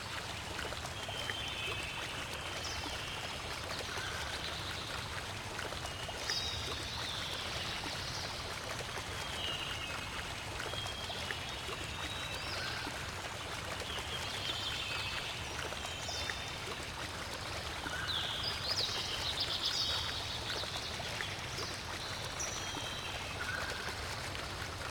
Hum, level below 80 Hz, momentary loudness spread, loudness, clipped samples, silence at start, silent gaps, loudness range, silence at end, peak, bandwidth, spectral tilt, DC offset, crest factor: none; -54 dBFS; 6 LU; -38 LUFS; under 0.1%; 0 s; none; 4 LU; 0 s; -20 dBFS; 19.5 kHz; -2.5 dB/octave; under 0.1%; 20 dB